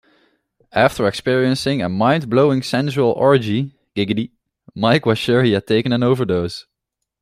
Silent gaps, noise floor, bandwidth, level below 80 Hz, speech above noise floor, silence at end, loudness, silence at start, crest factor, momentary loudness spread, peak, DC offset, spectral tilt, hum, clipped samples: none; -80 dBFS; 15 kHz; -54 dBFS; 63 dB; 0.6 s; -17 LUFS; 0.75 s; 16 dB; 9 LU; -2 dBFS; under 0.1%; -6.5 dB/octave; none; under 0.1%